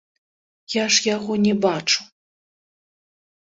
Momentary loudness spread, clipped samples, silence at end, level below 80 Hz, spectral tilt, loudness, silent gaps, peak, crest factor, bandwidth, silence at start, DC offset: 6 LU; under 0.1%; 1.35 s; -64 dBFS; -3 dB/octave; -20 LUFS; none; -2 dBFS; 22 dB; 8 kHz; 0.7 s; under 0.1%